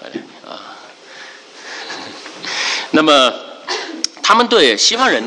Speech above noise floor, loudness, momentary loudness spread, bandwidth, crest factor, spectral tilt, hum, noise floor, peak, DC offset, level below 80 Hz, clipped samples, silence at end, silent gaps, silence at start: 25 dB; -13 LUFS; 24 LU; 11 kHz; 16 dB; -1.5 dB/octave; none; -37 dBFS; 0 dBFS; under 0.1%; -62 dBFS; under 0.1%; 0 s; none; 0 s